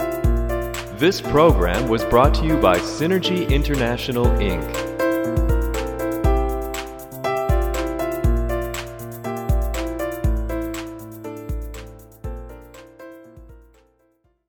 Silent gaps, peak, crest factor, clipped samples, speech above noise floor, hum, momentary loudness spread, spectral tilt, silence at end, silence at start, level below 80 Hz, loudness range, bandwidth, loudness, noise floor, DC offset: none; -2 dBFS; 20 dB; under 0.1%; 45 dB; none; 18 LU; -6 dB/octave; 0.9 s; 0 s; -26 dBFS; 13 LU; 19 kHz; -21 LUFS; -63 dBFS; under 0.1%